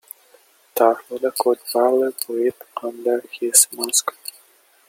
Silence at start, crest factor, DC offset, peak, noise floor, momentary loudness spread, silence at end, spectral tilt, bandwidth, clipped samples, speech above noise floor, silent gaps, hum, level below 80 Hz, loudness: 0.75 s; 22 dB; under 0.1%; 0 dBFS; -55 dBFS; 16 LU; 0.8 s; -0.5 dB/octave; 17 kHz; under 0.1%; 35 dB; none; none; -74 dBFS; -19 LUFS